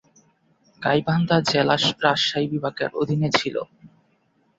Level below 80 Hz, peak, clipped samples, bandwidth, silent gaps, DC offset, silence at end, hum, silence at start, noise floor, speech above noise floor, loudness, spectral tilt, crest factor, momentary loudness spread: -58 dBFS; -4 dBFS; under 0.1%; 8 kHz; none; under 0.1%; 0.7 s; none; 0.8 s; -65 dBFS; 43 dB; -22 LUFS; -5 dB/octave; 20 dB; 9 LU